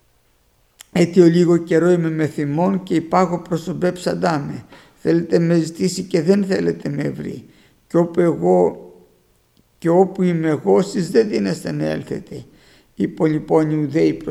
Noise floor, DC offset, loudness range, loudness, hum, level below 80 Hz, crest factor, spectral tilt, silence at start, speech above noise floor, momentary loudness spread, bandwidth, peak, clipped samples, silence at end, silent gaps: -59 dBFS; under 0.1%; 3 LU; -18 LUFS; none; -56 dBFS; 18 dB; -7 dB/octave; 0.95 s; 42 dB; 10 LU; 13 kHz; 0 dBFS; under 0.1%; 0 s; none